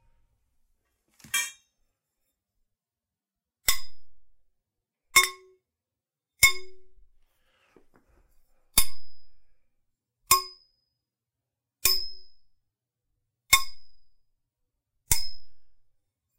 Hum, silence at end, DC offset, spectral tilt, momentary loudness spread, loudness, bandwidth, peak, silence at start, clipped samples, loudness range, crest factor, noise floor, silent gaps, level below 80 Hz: none; 0.75 s; under 0.1%; 1 dB/octave; 16 LU; -24 LUFS; 16 kHz; -4 dBFS; 1.25 s; under 0.1%; 9 LU; 26 dB; under -90 dBFS; none; -50 dBFS